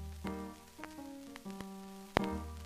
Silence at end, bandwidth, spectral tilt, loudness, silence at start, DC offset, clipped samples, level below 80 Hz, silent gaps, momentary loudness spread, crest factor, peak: 0 s; 15.5 kHz; -5.5 dB/octave; -42 LUFS; 0 s; under 0.1%; under 0.1%; -54 dBFS; none; 14 LU; 34 dB; -8 dBFS